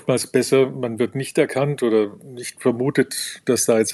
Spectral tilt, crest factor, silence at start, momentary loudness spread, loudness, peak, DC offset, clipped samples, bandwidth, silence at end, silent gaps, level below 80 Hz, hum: -4.5 dB/octave; 16 dB; 0.05 s; 7 LU; -20 LUFS; -4 dBFS; under 0.1%; under 0.1%; 13.5 kHz; 0 s; none; -72 dBFS; none